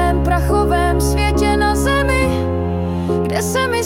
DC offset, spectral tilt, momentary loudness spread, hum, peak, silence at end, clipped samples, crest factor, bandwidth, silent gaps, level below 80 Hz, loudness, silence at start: under 0.1%; -5.5 dB/octave; 4 LU; none; -4 dBFS; 0 s; under 0.1%; 12 dB; 16.5 kHz; none; -22 dBFS; -16 LUFS; 0 s